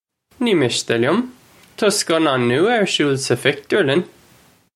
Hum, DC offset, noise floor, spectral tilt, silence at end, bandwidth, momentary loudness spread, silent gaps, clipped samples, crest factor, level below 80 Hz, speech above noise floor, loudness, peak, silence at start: none; under 0.1%; -52 dBFS; -4 dB/octave; 0.7 s; 14.5 kHz; 5 LU; none; under 0.1%; 18 dB; -62 dBFS; 35 dB; -18 LUFS; 0 dBFS; 0.4 s